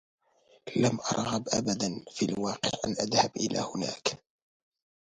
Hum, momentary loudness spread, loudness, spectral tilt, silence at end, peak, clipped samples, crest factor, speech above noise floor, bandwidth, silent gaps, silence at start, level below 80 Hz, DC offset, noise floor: none; 7 LU; -30 LUFS; -4 dB/octave; 0.85 s; -10 dBFS; under 0.1%; 22 dB; 34 dB; 10.5 kHz; none; 0.65 s; -64 dBFS; under 0.1%; -64 dBFS